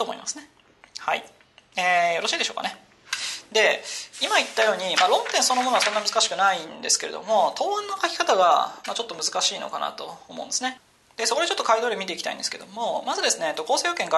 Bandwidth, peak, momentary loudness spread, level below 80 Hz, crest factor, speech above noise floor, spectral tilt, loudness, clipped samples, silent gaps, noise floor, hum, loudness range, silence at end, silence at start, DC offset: 12.5 kHz; -6 dBFS; 11 LU; -74 dBFS; 18 dB; 31 dB; 0 dB/octave; -23 LUFS; under 0.1%; none; -55 dBFS; none; 5 LU; 0 s; 0 s; under 0.1%